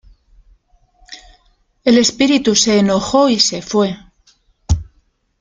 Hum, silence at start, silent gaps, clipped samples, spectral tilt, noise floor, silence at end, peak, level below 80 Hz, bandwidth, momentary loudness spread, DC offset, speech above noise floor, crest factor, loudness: none; 1.1 s; none; under 0.1%; -4 dB/octave; -59 dBFS; 0.6 s; 0 dBFS; -36 dBFS; 9.6 kHz; 9 LU; under 0.1%; 45 dB; 16 dB; -14 LUFS